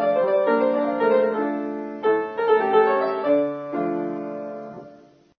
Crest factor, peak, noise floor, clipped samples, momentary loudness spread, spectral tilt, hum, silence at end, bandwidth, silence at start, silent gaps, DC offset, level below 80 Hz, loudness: 16 dB; -6 dBFS; -49 dBFS; under 0.1%; 14 LU; -8 dB/octave; none; 0.45 s; 5 kHz; 0 s; none; under 0.1%; -70 dBFS; -22 LUFS